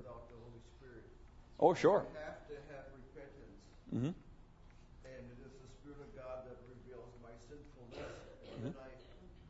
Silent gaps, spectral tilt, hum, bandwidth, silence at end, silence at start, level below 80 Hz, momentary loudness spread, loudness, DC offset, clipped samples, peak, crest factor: none; -6 dB/octave; none; 7.6 kHz; 0 s; 0 s; -60 dBFS; 26 LU; -38 LUFS; under 0.1%; under 0.1%; -16 dBFS; 26 dB